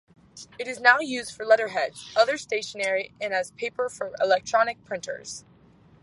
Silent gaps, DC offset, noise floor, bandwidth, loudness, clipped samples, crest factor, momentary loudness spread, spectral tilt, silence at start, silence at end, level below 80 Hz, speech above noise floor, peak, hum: none; under 0.1%; -55 dBFS; 11.5 kHz; -25 LUFS; under 0.1%; 22 dB; 15 LU; -2 dB/octave; 0.35 s; 0.65 s; -68 dBFS; 30 dB; -4 dBFS; none